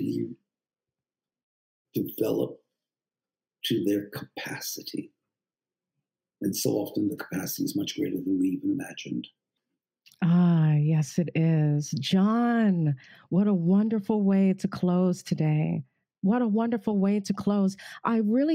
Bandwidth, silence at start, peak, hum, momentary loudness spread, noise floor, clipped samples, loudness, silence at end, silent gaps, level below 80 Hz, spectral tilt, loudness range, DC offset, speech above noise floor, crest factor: 16 kHz; 0 s; -12 dBFS; none; 12 LU; under -90 dBFS; under 0.1%; -27 LUFS; 0 s; 1.43-1.85 s; -72 dBFS; -6.5 dB/octave; 9 LU; under 0.1%; over 65 dB; 16 dB